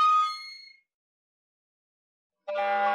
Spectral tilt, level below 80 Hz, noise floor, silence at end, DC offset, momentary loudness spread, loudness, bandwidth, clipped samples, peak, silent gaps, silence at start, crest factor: -1.5 dB/octave; under -90 dBFS; -48 dBFS; 0 s; under 0.1%; 21 LU; -27 LUFS; 11.5 kHz; under 0.1%; -16 dBFS; 0.94-2.30 s; 0 s; 14 dB